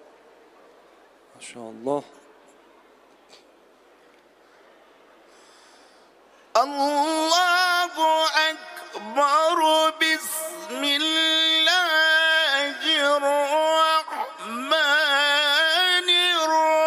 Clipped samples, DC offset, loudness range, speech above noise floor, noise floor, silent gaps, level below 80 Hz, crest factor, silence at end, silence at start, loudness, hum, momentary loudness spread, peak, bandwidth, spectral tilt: under 0.1%; under 0.1%; 18 LU; 29 dB; -55 dBFS; none; -82 dBFS; 20 dB; 0 s; 1.4 s; -20 LUFS; none; 14 LU; -4 dBFS; 15.5 kHz; 0 dB/octave